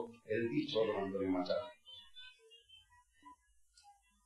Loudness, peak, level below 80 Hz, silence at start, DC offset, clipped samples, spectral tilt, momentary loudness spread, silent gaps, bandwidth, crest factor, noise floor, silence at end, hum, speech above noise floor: -38 LUFS; -24 dBFS; -72 dBFS; 0 s; under 0.1%; under 0.1%; -6.5 dB/octave; 20 LU; none; 11.5 kHz; 18 dB; -70 dBFS; 0.35 s; none; 33 dB